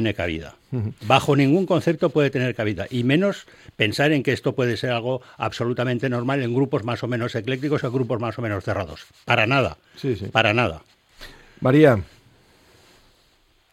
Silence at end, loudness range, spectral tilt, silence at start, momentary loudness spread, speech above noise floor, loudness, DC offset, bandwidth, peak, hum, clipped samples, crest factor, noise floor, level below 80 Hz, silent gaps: 1.7 s; 3 LU; -6.5 dB/octave; 0 s; 11 LU; 39 dB; -22 LUFS; under 0.1%; 15 kHz; 0 dBFS; none; under 0.1%; 22 dB; -60 dBFS; -52 dBFS; none